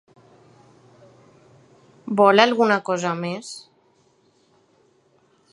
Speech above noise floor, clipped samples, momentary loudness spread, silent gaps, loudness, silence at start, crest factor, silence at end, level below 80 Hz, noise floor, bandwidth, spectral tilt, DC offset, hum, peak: 42 dB; under 0.1%; 23 LU; none; -19 LUFS; 2.05 s; 24 dB; 1.95 s; -74 dBFS; -61 dBFS; 11 kHz; -4.5 dB/octave; under 0.1%; none; 0 dBFS